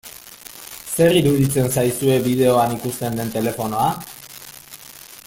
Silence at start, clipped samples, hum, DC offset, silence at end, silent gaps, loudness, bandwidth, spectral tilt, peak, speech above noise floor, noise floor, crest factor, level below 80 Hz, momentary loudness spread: 0.05 s; under 0.1%; none; under 0.1%; 0.05 s; none; -19 LUFS; 17 kHz; -5.5 dB/octave; -4 dBFS; 23 dB; -41 dBFS; 16 dB; -50 dBFS; 21 LU